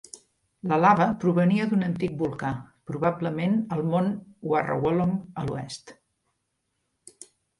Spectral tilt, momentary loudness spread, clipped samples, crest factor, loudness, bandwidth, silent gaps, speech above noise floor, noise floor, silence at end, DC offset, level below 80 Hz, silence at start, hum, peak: -7.5 dB/octave; 14 LU; under 0.1%; 20 dB; -25 LUFS; 11.5 kHz; none; 53 dB; -77 dBFS; 1.65 s; under 0.1%; -60 dBFS; 0.15 s; none; -6 dBFS